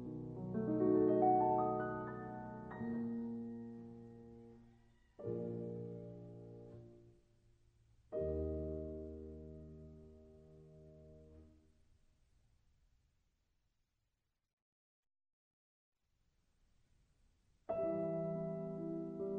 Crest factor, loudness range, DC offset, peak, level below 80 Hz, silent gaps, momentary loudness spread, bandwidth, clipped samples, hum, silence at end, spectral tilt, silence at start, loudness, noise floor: 22 dB; 20 LU; under 0.1%; -22 dBFS; -62 dBFS; 14.53-15.03 s, 15.33-15.92 s; 27 LU; 4.4 kHz; under 0.1%; none; 0 s; -11 dB/octave; 0 s; -40 LUFS; -87 dBFS